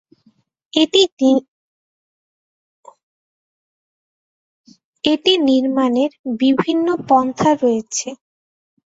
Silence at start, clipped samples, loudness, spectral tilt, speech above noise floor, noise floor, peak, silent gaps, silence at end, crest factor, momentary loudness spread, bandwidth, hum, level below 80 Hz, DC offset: 0.75 s; under 0.1%; -16 LUFS; -4 dB/octave; 43 dB; -58 dBFS; -2 dBFS; 1.12-1.17 s, 1.48-2.83 s, 3.03-4.64 s, 4.84-4.93 s, 6.19-6.24 s; 0.85 s; 18 dB; 8 LU; 8 kHz; none; -62 dBFS; under 0.1%